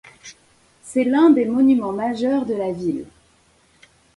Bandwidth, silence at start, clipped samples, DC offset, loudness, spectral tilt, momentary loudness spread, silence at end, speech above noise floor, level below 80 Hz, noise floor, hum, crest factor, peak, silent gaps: 11.5 kHz; 0.25 s; under 0.1%; under 0.1%; -19 LUFS; -6.5 dB/octave; 11 LU; 1.1 s; 40 dB; -58 dBFS; -57 dBFS; none; 16 dB; -4 dBFS; none